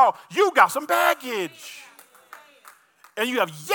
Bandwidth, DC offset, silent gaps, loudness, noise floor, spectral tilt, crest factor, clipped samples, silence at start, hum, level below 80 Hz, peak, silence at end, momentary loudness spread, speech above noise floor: 18 kHz; under 0.1%; none; -21 LUFS; -52 dBFS; -2.5 dB/octave; 22 dB; under 0.1%; 0 s; none; -84 dBFS; -2 dBFS; 0 s; 21 LU; 30 dB